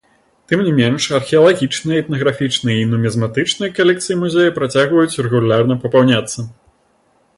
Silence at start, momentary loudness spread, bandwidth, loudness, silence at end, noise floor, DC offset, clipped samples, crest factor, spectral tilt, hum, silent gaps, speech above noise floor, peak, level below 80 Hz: 0.5 s; 6 LU; 11.5 kHz; -15 LUFS; 0.85 s; -58 dBFS; under 0.1%; under 0.1%; 14 dB; -5.5 dB/octave; none; none; 43 dB; 0 dBFS; -52 dBFS